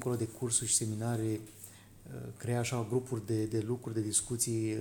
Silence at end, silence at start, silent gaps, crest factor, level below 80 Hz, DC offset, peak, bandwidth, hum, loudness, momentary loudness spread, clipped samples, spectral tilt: 0 s; 0 s; none; 20 dB; -64 dBFS; under 0.1%; -14 dBFS; 19 kHz; none; -33 LUFS; 16 LU; under 0.1%; -4.5 dB/octave